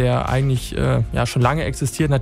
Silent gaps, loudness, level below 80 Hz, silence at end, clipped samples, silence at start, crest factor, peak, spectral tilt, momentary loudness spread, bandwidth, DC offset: none; -20 LUFS; -32 dBFS; 0 s; under 0.1%; 0 s; 18 dB; -2 dBFS; -6 dB/octave; 3 LU; 15 kHz; under 0.1%